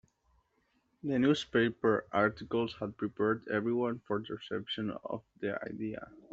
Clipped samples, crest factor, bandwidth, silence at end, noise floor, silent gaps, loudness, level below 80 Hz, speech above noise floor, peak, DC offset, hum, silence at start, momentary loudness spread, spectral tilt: under 0.1%; 20 dB; 8 kHz; 0.15 s; -75 dBFS; none; -33 LUFS; -68 dBFS; 42 dB; -14 dBFS; under 0.1%; none; 1.05 s; 11 LU; -4.5 dB/octave